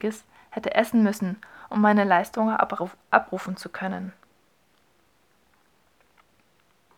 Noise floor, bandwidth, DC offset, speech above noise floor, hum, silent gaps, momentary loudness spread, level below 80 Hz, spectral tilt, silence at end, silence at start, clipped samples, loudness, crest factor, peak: -65 dBFS; 16 kHz; under 0.1%; 41 dB; none; none; 15 LU; -68 dBFS; -6 dB/octave; 2.9 s; 0 s; under 0.1%; -24 LUFS; 24 dB; -2 dBFS